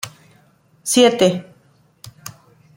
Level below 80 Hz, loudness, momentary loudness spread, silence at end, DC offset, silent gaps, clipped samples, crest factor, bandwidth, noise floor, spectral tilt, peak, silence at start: -64 dBFS; -16 LUFS; 24 LU; 0.45 s; under 0.1%; none; under 0.1%; 18 dB; 16.5 kHz; -55 dBFS; -3.5 dB/octave; -2 dBFS; 0.05 s